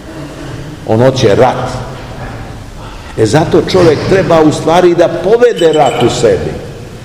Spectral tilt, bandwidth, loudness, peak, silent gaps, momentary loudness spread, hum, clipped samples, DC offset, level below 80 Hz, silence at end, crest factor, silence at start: -6 dB/octave; 15 kHz; -9 LUFS; 0 dBFS; none; 18 LU; none; 3%; 0.3%; -32 dBFS; 0 s; 10 dB; 0 s